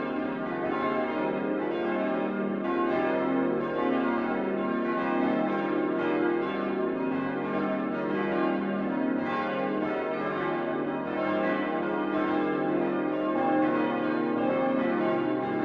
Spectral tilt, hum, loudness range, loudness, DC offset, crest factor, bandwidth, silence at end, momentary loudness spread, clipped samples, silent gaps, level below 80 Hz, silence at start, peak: -8.5 dB/octave; none; 2 LU; -28 LUFS; under 0.1%; 14 dB; 5.8 kHz; 0 s; 3 LU; under 0.1%; none; -64 dBFS; 0 s; -14 dBFS